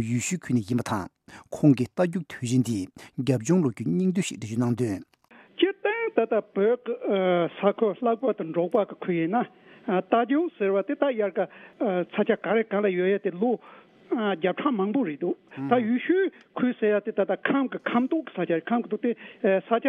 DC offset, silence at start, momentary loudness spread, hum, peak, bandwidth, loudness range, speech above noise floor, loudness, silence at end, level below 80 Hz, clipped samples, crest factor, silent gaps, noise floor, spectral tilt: under 0.1%; 0 s; 7 LU; none; -6 dBFS; 14 kHz; 1 LU; 29 dB; -26 LUFS; 0 s; -70 dBFS; under 0.1%; 20 dB; none; -54 dBFS; -6.5 dB/octave